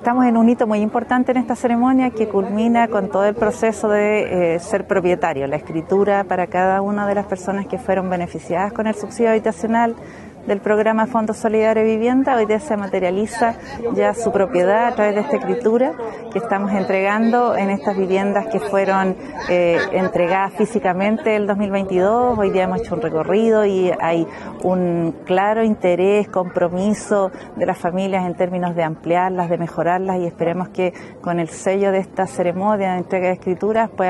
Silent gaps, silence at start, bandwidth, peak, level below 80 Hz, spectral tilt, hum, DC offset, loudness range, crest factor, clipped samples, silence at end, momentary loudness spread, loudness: none; 0 s; 12 kHz; -6 dBFS; -52 dBFS; -6.5 dB/octave; none; under 0.1%; 3 LU; 12 dB; under 0.1%; 0 s; 6 LU; -18 LUFS